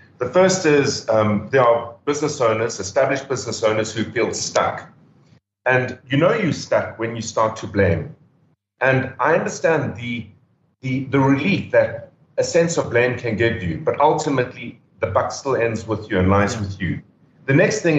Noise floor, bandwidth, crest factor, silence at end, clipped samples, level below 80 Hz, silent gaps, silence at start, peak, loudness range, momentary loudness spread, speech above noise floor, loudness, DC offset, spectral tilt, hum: -61 dBFS; 8.4 kHz; 16 dB; 0 s; under 0.1%; -54 dBFS; none; 0.2 s; -4 dBFS; 3 LU; 10 LU; 42 dB; -20 LUFS; under 0.1%; -5 dB/octave; none